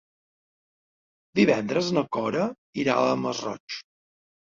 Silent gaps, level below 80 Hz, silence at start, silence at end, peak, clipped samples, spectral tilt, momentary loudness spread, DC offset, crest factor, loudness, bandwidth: 2.58-2.73 s, 3.60-3.68 s; -66 dBFS; 1.35 s; 0.6 s; -8 dBFS; under 0.1%; -5.5 dB/octave; 12 LU; under 0.1%; 20 dB; -25 LUFS; 7.6 kHz